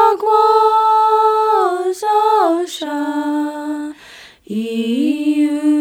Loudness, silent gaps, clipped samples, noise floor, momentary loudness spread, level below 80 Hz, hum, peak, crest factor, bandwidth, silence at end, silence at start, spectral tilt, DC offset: -15 LUFS; none; under 0.1%; -41 dBFS; 12 LU; -64 dBFS; none; 0 dBFS; 14 dB; 16.5 kHz; 0 s; 0 s; -4.5 dB/octave; under 0.1%